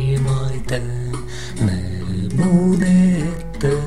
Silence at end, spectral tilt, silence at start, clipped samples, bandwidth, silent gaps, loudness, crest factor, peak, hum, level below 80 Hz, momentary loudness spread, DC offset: 0 s; -7.5 dB/octave; 0 s; under 0.1%; 12 kHz; none; -19 LUFS; 16 dB; -4 dBFS; none; -32 dBFS; 11 LU; 3%